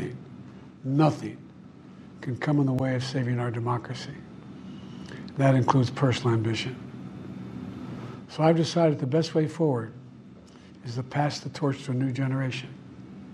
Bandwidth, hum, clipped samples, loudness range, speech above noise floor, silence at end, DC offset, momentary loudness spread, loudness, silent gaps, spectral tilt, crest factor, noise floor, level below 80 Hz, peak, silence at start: 10.5 kHz; none; under 0.1%; 3 LU; 23 dB; 0 s; under 0.1%; 21 LU; -27 LUFS; none; -7 dB/octave; 22 dB; -49 dBFS; -62 dBFS; -6 dBFS; 0 s